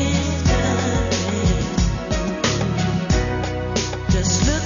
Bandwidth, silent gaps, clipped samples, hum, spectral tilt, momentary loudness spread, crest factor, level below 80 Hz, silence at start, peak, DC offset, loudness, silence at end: 7.4 kHz; none; under 0.1%; none; -5 dB/octave; 4 LU; 14 dB; -26 dBFS; 0 s; -6 dBFS; under 0.1%; -21 LUFS; 0 s